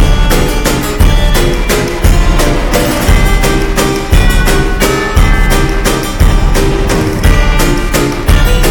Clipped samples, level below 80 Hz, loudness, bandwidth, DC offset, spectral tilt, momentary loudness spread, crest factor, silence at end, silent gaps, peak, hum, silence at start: 0.5%; -10 dBFS; -11 LUFS; 18 kHz; under 0.1%; -4.5 dB/octave; 2 LU; 8 dB; 0 s; none; 0 dBFS; none; 0 s